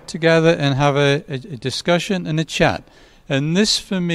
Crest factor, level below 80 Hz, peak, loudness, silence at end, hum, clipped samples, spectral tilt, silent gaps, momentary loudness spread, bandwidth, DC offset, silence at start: 18 dB; -46 dBFS; -2 dBFS; -18 LUFS; 0 s; none; under 0.1%; -5 dB/octave; none; 10 LU; 13.5 kHz; under 0.1%; 0.1 s